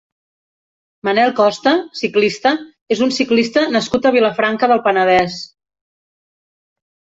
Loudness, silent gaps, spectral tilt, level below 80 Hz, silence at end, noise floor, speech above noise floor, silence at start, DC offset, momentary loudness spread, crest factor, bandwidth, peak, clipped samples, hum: -15 LUFS; 2.81-2.86 s; -4.5 dB/octave; -56 dBFS; 1.65 s; under -90 dBFS; over 75 dB; 1.05 s; under 0.1%; 9 LU; 14 dB; 8 kHz; -2 dBFS; under 0.1%; none